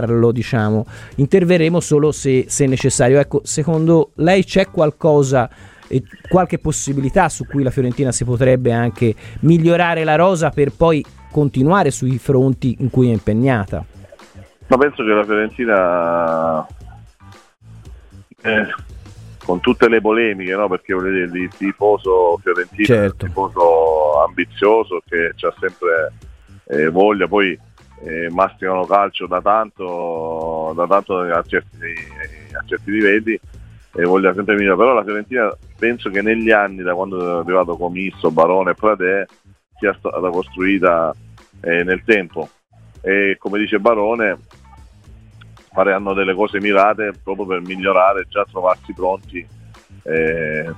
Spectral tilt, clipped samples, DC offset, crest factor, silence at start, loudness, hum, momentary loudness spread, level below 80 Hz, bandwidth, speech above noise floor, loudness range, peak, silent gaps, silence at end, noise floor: -6 dB/octave; under 0.1%; under 0.1%; 16 dB; 0 s; -16 LUFS; none; 9 LU; -42 dBFS; 13.5 kHz; 28 dB; 4 LU; 0 dBFS; none; 0 s; -44 dBFS